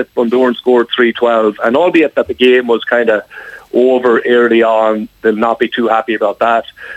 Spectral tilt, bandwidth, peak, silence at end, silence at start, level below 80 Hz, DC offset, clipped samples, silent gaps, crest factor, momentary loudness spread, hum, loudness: -6 dB/octave; 8 kHz; 0 dBFS; 0 s; 0 s; -54 dBFS; under 0.1%; under 0.1%; none; 12 dB; 6 LU; none; -12 LUFS